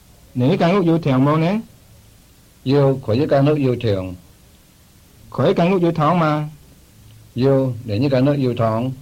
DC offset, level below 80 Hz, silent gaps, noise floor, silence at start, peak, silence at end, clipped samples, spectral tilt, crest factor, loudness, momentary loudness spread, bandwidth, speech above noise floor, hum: under 0.1%; -50 dBFS; none; -49 dBFS; 0.35 s; -4 dBFS; 0 s; under 0.1%; -8.5 dB/octave; 14 dB; -18 LUFS; 9 LU; 15.5 kHz; 33 dB; none